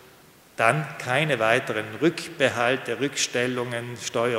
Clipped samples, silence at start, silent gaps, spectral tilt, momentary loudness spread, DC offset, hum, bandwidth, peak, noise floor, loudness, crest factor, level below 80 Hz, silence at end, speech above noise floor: under 0.1%; 0.6 s; none; -4 dB/octave; 8 LU; under 0.1%; none; 16 kHz; -2 dBFS; -52 dBFS; -24 LUFS; 22 dB; -68 dBFS; 0 s; 28 dB